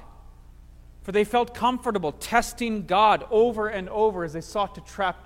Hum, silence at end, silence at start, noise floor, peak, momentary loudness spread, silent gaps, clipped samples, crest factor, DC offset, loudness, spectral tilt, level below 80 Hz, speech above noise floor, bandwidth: 60 Hz at -50 dBFS; 0.05 s; 0 s; -47 dBFS; -6 dBFS; 9 LU; none; under 0.1%; 18 dB; under 0.1%; -24 LUFS; -4.5 dB/octave; -46 dBFS; 23 dB; 16.5 kHz